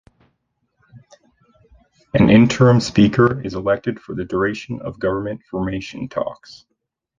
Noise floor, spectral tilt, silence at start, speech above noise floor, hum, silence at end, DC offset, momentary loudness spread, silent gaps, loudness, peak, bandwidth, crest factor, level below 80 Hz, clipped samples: -70 dBFS; -7 dB/octave; 0.95 s; 53 dB; none; 0.65 s; under 0.1%; 15 LU; none; -18 LUFS; -2 dBFS; 9 kHz; 18 dB; -44 dBFS; under 0.1%